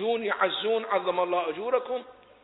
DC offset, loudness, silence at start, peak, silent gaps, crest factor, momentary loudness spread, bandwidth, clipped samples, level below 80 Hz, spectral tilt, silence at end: under 0.1%; -28 LUFS; 0 s; -10 dBFS; none; 18 dB; 3 LU; 4.1 kHz; under 0.1%; -74 dBFS; -8 dB/octave; 0.3 s